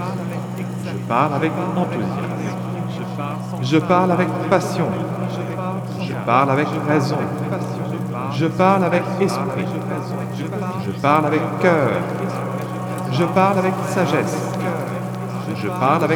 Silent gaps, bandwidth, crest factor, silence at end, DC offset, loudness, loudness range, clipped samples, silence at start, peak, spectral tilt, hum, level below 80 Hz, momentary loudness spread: none; 19 kHz; 18 dB; 0 s; under 0.1%; -20 LUFS; 2 LU; under 0.1%; 0 s; -2 dBFS; -7 dB/octave; none; -58 dBFS; 10 LU